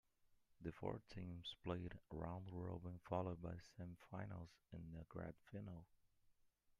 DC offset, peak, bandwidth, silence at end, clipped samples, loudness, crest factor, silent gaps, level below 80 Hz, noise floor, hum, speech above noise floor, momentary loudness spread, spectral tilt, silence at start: under 0.1%; -30 dBFS; 11 kHz; 0.5 s; under 0.1%; -53 LUFS; 22 dB; none; -70 dBFS; -78 dBFS; none; 27 dB; 10 LU; -7.5 dB/octave; 0.25 s